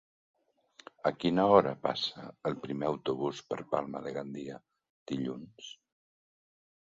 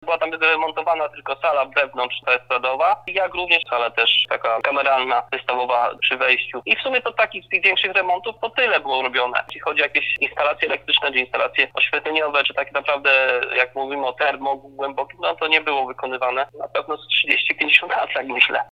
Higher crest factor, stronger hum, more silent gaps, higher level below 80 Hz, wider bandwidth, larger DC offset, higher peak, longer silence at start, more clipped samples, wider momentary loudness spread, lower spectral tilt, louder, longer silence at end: first, 26 dB vs 20 dB; neither; first, 4.90-5.06 s vs none; second, -68 dBFS vs -62 dBFS; second, 7.8 kHz vs 9.6 kHz; neither; second, -8 dBFS vs 0 dBFS; first, 1.05 s vs 0 s; neither; first, 20 LU vs 8 LU; first, -6 dB/octave vs -3.5 dB/octave; second, -32 LUFS vs -19 LUFS; first, 1.2 s vs 0.05 s